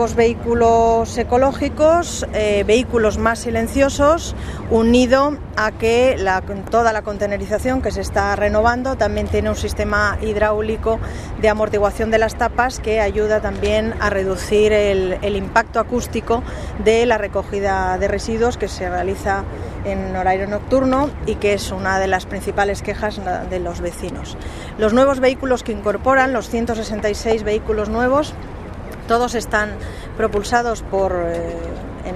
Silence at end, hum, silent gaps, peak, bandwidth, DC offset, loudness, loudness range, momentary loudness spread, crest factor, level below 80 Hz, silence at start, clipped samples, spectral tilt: 0 s; none; none; 0 dBFS; 14 kHz; under 0.1%; -18 LUFS; 4 LU; 9 LU; 18 dB; -30 dBFS; 0 s; under 0.1%; -5.5 dB/octave